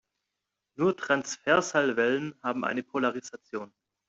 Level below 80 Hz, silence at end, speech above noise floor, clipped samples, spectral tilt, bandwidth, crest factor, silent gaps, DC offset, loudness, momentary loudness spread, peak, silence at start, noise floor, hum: -72 dBFS; 0.4 s; 57 dB; under 0.1%; -4 dB/octave; 8.2 kHz; 20 dB; none; under 0.1%; -28 LUFS; 15 LU; -10 dBFS; 0.8 s; -85 dBFS; none